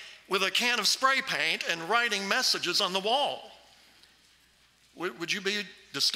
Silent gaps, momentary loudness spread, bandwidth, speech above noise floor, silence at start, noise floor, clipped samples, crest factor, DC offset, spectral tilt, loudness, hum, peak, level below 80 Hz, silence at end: none; 11 LU; 16 kHz; 35 dB; 0 s; -63 dBFS; under 0.1%; 20 dB; under 0.1%; -1 dB/octave; -27 LUFS; none; -10 dBFS; -76 dBFS; 0 s